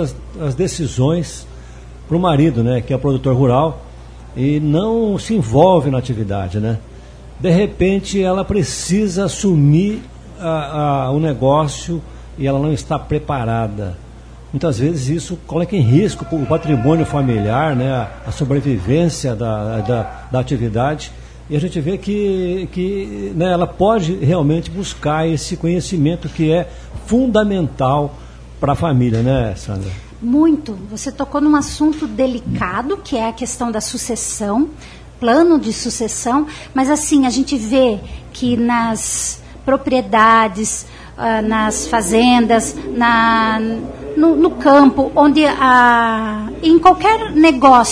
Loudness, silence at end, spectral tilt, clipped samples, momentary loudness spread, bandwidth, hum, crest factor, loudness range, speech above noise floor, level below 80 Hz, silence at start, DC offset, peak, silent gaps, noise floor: -16 LUFS; 0 s; -5.5 dB/octave; under 0.1%; 11 LU; 11 kHz; none; 16 dB; 6 LU; 21 dB; -36 dBFS; 0 s; under 0.1%; 0 dBFS; none; -35 dBFS